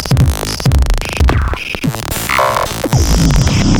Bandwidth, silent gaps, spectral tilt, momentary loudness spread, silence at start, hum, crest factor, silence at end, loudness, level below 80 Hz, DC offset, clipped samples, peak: over 20 kHz; none; -5 dB/octave; 7 LU; 0 s; none; 12 dB; 0 s; -14 LUFS; -16 dBFS; under 0.1%; under 0.1%; 0 dBFS